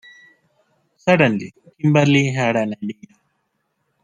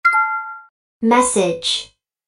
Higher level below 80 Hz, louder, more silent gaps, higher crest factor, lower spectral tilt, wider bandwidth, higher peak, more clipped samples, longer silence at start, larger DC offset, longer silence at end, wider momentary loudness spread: about the same, -60 dBFS vs -56 dBFS; about the same, -18 LUFS vs -17 LUFS; second, none vs 0.70-1.00 s; about the same, 18 dB vs 16 dB; first, -6.5 dB/octave vs -2.5 dB/octave; second, 9.6 kHz vs 11.5 kHz; about the same, -2 dBFS vs -2 dBFS; neither; first, 1.05 s vs 0.05 s; neither; first, 1.1 s vs 0.4 s; second, 16 LU vs 20 LU